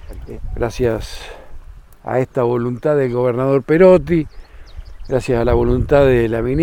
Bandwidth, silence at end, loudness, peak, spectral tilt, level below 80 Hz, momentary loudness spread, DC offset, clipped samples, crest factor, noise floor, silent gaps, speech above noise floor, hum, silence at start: 16 kHz; 0 s; -16 LUFS; 0 dBFS; -8 dB/octave; -30 dBFS; 20 LU; under 0.1%; under 0.1%; 16 dB; -35 dBFS; none; 20 dB; none; 0 s